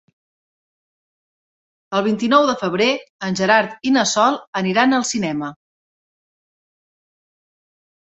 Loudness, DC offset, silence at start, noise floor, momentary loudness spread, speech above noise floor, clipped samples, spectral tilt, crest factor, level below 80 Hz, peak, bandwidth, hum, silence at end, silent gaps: -18 LUFS; under 0.1%; 1.9 s; under -90 dBFS; 9 LU; over 72 dB; under 0.1%; -4 dB/octave; 20 dB; -64 dBFS; -2 dBFS; 8.4 kHz; none; 2.6 s; 3.09-3.19 s, 4.47-4.53 s